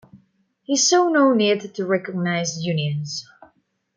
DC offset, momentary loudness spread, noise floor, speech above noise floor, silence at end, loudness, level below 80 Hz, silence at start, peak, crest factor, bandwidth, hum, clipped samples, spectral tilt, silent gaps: under 0.1%; 10 LU; -62 dBFS; 42 dB; 0.75 s; -20 LUFS; -70 dBFS; 0.15 s; -6 dBFS; 16 dB; 10 kHz; none; under 0.1%; -4 dB/octave; none